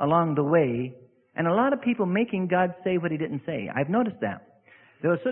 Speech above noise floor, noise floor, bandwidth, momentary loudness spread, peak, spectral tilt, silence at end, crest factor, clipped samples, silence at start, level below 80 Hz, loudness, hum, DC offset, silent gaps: 31 dB; -56 dBFS; 3.8 kHz; 10 LU; -8 dBFS; -11.5 dB/octave; 0 s; 16 dB; under 0.1%; 0 s; -66 dBFS; -26 LUFS; none; under 0.1%; none